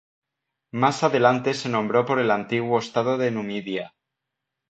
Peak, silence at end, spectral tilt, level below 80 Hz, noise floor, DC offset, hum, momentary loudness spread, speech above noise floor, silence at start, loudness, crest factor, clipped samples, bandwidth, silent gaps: -4 dBFS; 0.8 s; -5.5 dB/octave; -68 dBFS; -83 dBFS; under 0.1%; none; 11 LU; 61 dB; 0.75 s; -23 LUFS; 20 dB; under 0.1%; 8.6 kHz; none